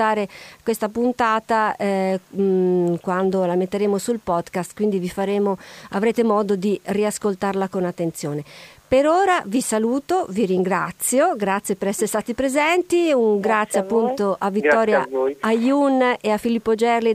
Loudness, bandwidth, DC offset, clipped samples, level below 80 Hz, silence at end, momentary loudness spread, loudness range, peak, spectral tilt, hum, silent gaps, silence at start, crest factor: -20 LUFS; 15.5 kHz; under 0.1%; under 0.1%; -56 dBFS; 0 s; 6 LU; 3 LU; -4 dBFS; -5 dB/octave; none; none; 0 s; 16 dB